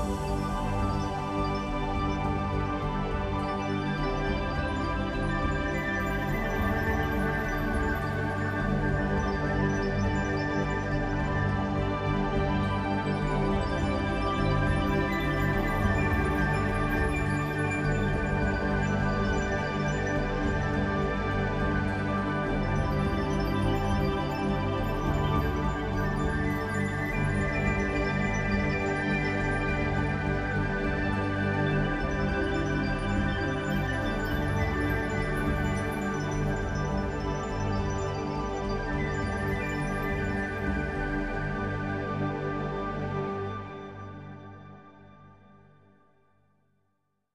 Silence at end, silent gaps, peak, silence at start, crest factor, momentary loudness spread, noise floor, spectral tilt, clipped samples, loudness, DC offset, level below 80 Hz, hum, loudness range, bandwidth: 2 s; none; -14 dBFS; 0 s; 14 dB; 4 LU; -77 dBFS; -7 dB/octave; under 0.1%; -29 LUFS; 0.1%; -36 dBFS; 50 Hz at -45 dBFS; 3 LU; 14.5 kHz